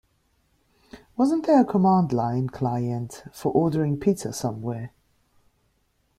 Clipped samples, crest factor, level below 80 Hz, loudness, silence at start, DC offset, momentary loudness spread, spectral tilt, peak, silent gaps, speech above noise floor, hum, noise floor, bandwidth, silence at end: under 0.1%; 18 dB; -58 dBFS; -24 LUFS; 0.95 s; under 0.1%; 13 LU; -7.5 dB/octave; -6 dBFS; none; 46 dB; none; -69 dBFS; 15 kHz; 1.3 s